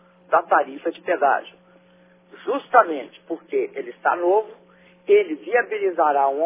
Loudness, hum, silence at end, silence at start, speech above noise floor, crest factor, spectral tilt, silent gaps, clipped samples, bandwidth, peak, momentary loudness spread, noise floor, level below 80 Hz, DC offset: -21 LUFS; none; 0 s; 0.3 s; 34 dB; 20 dB; -7.5 dB/octave; none; under 0.1%; 3.8 kHz; -2 dBFS; 13 LU; -54 dBFS; -82 dBFS; under 0.1%